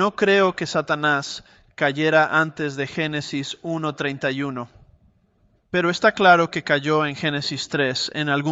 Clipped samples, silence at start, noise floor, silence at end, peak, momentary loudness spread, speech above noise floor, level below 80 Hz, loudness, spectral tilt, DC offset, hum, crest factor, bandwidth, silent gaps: under 0.1%; 0 s; -62 dBFS; 0 s; -2 dBFS; 11 LU; 41 dB; -60 dBFS; -21 LUFS; -4.5 dB/octave; under 0.1%; none; 20 dB; 8.2 kHz; none